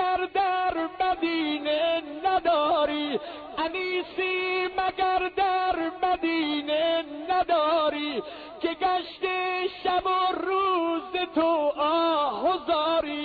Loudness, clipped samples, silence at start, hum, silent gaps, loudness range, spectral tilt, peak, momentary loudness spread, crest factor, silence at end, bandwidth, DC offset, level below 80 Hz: -26 LUFS; under 0.1%; 0 s; none; none; 2 LU; -6 dB/octave; -14 dBFS; 6 LU; 12 dB; 0 s; 4.9 kHz; under 0.1%; -58 dBFS